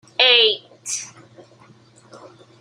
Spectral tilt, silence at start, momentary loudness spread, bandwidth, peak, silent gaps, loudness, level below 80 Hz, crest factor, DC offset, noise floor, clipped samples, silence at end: 1 dB/octave; 0.2 s; 16 LU; 15.5 kHz; 0 dBFS; none; -16 LUFS; -78 dBFS; 22 dB; under 0.1%; -50 dBFS; under 0.1%; 0.45 s